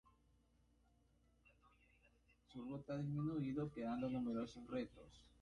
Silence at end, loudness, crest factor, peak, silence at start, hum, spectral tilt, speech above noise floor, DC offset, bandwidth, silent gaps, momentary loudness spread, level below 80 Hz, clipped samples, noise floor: 0.15 s; -46 LUFS; 14 dB; -34 dBFS; 2.5 s; none; -8.5 dB/octave; 31 dB; under 0.1%; 10.5 kHz; none; 13 LU; -72 dBFS; under 0.1%; -76 dBFS